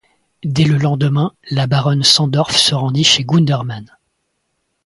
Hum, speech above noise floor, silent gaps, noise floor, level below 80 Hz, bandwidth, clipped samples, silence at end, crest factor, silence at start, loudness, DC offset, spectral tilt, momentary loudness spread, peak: none; 55 dB; none; -69 dBFS; -50 dBFS; 11.5 kHz; under 0.1%; 1 s; 16 dB; 0.45 s; -14 LUFS; under 0.1%; -4.5 dB/octave; 10 LU; 0 dBFS